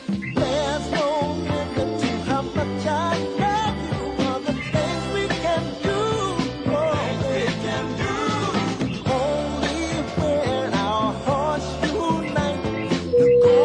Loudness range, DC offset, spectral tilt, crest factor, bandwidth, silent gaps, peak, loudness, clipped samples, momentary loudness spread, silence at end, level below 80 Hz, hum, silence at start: 1 LU; under 0.1%; -5.5 dB/octave; 16 dB; 10 kHz; none; -6 dBFS; -23 LUFS; under 0.1%; 3 LU; 0 s; -42 dBFS; none; 0 s